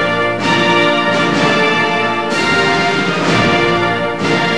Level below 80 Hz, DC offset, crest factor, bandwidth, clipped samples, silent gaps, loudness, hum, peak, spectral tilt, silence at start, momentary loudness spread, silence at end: -44 dBFS; 2%; 14 dB; 11 kHz; under 0.1%; none; -13 LUFS; none; 0 dBFS; -4.5 dB/octave; 0 s; 4 LU; 0 s